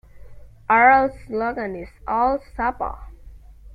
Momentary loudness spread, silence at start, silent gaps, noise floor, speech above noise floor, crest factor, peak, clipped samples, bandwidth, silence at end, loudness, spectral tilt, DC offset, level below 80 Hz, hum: 18 LU; 0.15 s; none; -43 dBFS; 23 dB; 20 dB; -2 dBFS; under 0.1%; 5 kHz; 0 s; -20 LUFS; -7.5 dB/octave; under 0.1%; -42 dBFS; none